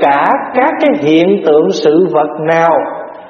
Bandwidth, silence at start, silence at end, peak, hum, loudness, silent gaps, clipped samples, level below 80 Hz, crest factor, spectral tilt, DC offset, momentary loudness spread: 7 kHz; 0 s; 0 s; 0 dBFS; none; -10 LUFS; none; under 0.1%; -58 dBFS; 10 dB; -6 dB/octave; under 0.1%; 3 LU